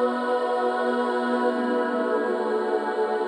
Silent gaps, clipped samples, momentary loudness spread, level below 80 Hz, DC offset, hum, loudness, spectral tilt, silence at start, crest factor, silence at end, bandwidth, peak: none; under 0.1%; 1 LU; -76 dBFS; under 0.1%; none; -24 LUFS; -5 dB/octave; 0 s; 12 dB; 0 s; 10 kHz; -12 dBFS